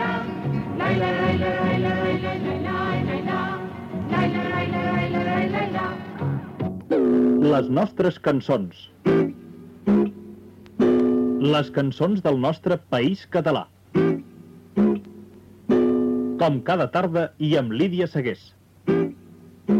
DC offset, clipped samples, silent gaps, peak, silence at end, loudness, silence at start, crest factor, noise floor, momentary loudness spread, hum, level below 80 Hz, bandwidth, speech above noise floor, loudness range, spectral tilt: under 0.1%; under 0.1%; none; -10 dBFS; 0 s; -23 LUFS; 0 s; 12 dB; -47 dBFS; 10 LU; none; -54 dBFS; 8.4 kHz; 25 dB; 3 LU; -8 dB/octave